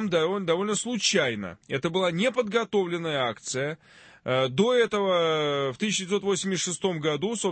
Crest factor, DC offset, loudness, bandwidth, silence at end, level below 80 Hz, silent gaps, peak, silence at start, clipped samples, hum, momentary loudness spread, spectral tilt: 16 dB; under 0.1%; -26 LUFS; 8.8 kHz; 0 s; -66 dBFS; none; -10 dBFS; 0 s; under 0.1%; none; 7 LU; -4 dB/octave